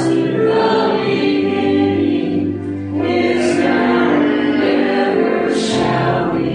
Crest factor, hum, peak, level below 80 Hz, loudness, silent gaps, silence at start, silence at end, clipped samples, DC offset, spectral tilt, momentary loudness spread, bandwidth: 12 dB; none; -2 dBFS; -50 dBFS; -15 LUFS; none; 0 s; 0 s; under 0.1%; under 0.1%; -6 dB/octave; 4 LU; 10 kHz